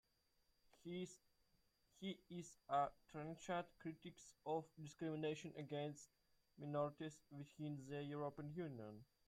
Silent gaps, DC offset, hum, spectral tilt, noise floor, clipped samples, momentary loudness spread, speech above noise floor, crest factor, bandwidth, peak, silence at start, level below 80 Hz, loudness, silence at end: none; under 0.1%; none; -6 dB/octave; -82 dBFS; under 0.1%; 13 LU; 33 dB; 20 dB; 15.5 kHz; -30 dBFS; 0.85 s; -82 dBFS; -50 LUFS; 0.25 s